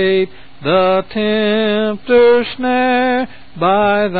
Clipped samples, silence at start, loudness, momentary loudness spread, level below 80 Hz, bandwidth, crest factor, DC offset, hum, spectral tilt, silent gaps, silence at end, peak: under 0.1%; 0 s; -14 LUFS; 8 LU; -48 dBFS; 4.8 kHz; 14 dB; 2%; none; -11 dB/octave; none; 0 s; 0 dBFS